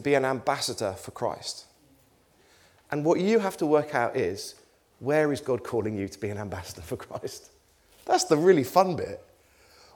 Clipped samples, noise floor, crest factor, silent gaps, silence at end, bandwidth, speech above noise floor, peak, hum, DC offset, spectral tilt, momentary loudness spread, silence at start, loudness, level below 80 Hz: under 0.1%; -62 dBFS; 22 dB; none; 0.75 s; 19.5 kHz; 36 dB; -6 dBFS; none; under 0.1%; -5 dB/octave; 16 LU; 0 s; -27 LUFS; -62 dBFS